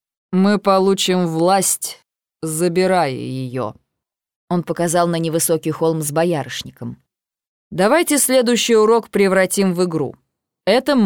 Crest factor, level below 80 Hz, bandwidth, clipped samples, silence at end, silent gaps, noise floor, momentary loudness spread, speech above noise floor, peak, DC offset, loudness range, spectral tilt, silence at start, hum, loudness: 14 dB; -60 dBFS; over 20 kHz; under 0.1%; 0 s; 4.36-4.48 s, 7.48-7.71 s; -81 dBFS; 13 LU; 65 dB; -2 dBFS; under 0.1%; 4 LU; -4.5 dB/octave; 0.3 s; none; -17 LUFS